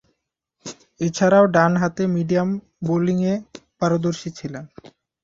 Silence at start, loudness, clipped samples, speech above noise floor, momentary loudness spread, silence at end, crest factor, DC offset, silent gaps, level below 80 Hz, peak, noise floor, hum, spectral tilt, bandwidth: 0.65 s; -20 LUFS; under 0.1%; 57 dB; 21 LU; 0.55 s; 20 dB; under 0.1%; none; -58 dBFS; -2 dBFS; -76 dBFS; none; -6.5 dB/octave; 7.8 kHz